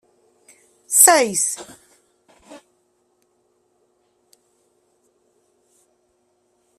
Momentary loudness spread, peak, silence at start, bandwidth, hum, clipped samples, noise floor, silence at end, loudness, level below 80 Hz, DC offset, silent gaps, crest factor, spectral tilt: 21 LU; 0 dBFS; 0.9 s; 15.5 kHz; none; under 0.1%; -66 dBFS; 4.25 s; -14 LUFS; -72 dBFS; under 0.1%; none; 24 dB; -0.5 dB/octave